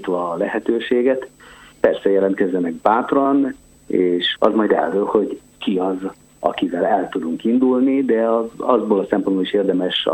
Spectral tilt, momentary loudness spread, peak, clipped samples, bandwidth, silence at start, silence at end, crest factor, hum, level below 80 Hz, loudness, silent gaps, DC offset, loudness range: -6.5 dB/octave; 7 LU; 0 dBFS; under 0.1%; 8.4 kHz; 0 s; 0 s; 18 dB; none; -58 dBFS; -19 LUFS; none; under 0.1%; 2 LU